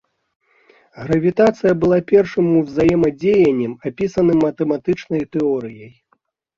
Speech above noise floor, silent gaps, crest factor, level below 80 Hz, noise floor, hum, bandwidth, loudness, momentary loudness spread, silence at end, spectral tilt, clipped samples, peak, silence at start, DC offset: 48 dB; none; 16 dB; -48 dBFS; -64 dBFS; none; 7.4 kHz; -17 LUFS; 8 LU; 0.7 s; -8 dB/octave; under 0.1%; -2 dBFS; 0.95 s; under 0.1%